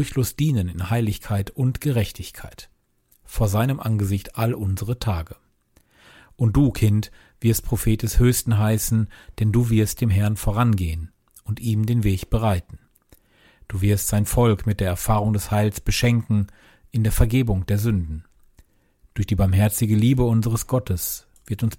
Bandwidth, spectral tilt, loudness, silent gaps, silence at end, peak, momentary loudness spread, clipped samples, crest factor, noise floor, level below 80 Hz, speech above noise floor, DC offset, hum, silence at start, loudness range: 17 kHz; -6 dB/octave; -22 LUFS; none; 0 s; -4 dBFS; 11 LU; under 0.1%; 18 dB; -62 dBFS; -34 dBFS; 42 dB; under 0.1%; none; 0 s; 4 LU